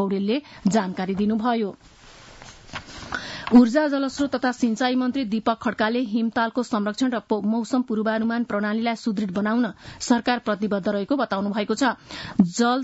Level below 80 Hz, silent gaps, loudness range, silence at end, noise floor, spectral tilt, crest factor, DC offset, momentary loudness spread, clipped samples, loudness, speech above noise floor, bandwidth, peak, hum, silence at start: -56 dBFS; none; 3 LU; 0 s; -45 dBFS; -5.5 dB/octave; 18 dB; under 0.1%; 10 LU; under 0.1%; -23 LUFS; 22 dB; 8 kHz; -6 dBFS; none; 0 s